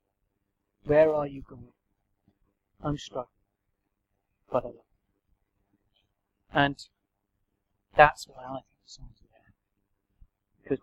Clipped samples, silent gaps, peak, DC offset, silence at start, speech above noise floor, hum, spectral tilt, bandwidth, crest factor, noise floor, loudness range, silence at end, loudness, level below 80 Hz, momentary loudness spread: under 0.1%; none; -2 dBFS; under 0.1%; 0.85 s; 53 dB; none; -5.5 dB/octave; 12.5 kHz; 30 dB; -79 dBFS; 12 LU; 0.05 s; -26 LUFS; -54 dBFS; 23 LU